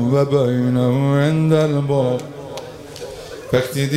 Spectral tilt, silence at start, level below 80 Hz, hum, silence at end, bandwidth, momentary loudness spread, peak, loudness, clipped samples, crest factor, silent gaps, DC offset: -7 dB/octave; 0 s; -52 dBFS; none; 0 s; 15.5 kHz; 17 LU; -2 dBFS; -17 LUFS; under 0.1%; 14 dB; none; under 0.1%